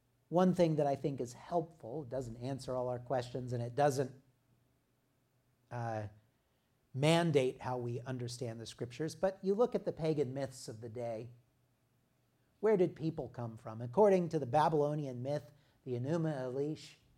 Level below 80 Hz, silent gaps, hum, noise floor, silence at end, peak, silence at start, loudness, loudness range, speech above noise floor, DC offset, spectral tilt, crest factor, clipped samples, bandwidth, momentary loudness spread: -70 dBFS; none; none; -76 dBFS; 0.25 s; -16 dBFS; 0.3 s; -36 LUFS; 6 LU; 42 dB; under 0.1%; -6.5 dB/octave; 22 dB; under 0.1%; 15 kHz; 14 LU